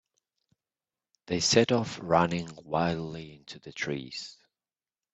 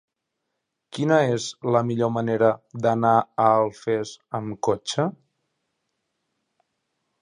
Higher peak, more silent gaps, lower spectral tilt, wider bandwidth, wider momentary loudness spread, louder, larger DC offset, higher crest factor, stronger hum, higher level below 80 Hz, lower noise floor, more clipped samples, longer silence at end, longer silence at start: about the same, -6 dBFS vs -4 dBFS; neither; second, -4 dB/octave vs -6 dB/octave; second, 8.4 kHz vs 11 kHz; first, 20 LU vs 9 LU; second, -28 LUFS vs -23 LUFS; neither; first, 26 dB vs 20 dB; neither; about the same, -62 dBFS vs -66 dBFS; first, under -90 dBFS vs -80 dBFS; neither; second, 0.85 s vs 2.1 s; first, 1.3 s vs 0.95 s